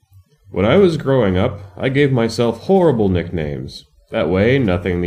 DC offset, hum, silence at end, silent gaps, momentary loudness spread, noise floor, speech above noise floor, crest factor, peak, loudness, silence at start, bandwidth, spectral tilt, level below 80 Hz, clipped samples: under 0.1%; none; 0 s; none; 12 LU; -48 dBFS; 33 dB; 16 dB; 0 dBFS; -16 LUFS; 0.5 s; 12 kHz; -7.5 dB/octave; -42 dBFS; under 0.1%